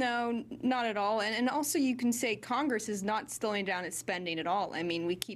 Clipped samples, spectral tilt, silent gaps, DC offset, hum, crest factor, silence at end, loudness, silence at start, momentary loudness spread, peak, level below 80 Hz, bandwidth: under 0.1%; -3.5 dB/octave; none; under 0.1%; none; 24 dB; 0 s; -32 LUFS; 0 s; 4 LU; -10 dBFS; -72 dBFS; 15.5 kHz